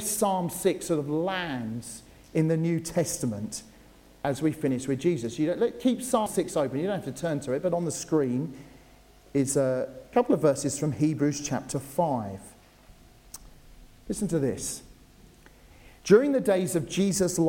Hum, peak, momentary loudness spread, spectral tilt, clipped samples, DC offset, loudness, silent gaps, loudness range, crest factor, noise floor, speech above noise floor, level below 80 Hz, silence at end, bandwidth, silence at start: none; -6 dBFS; 12 LU; -5.5 dB/octave; under 0.1%; under 0.1%; -27 LUFS; none; 6 LU; 22 dB; -55 dBFS; 28 dB; -56 dBFS; 0 s; 17 kHz; 0 s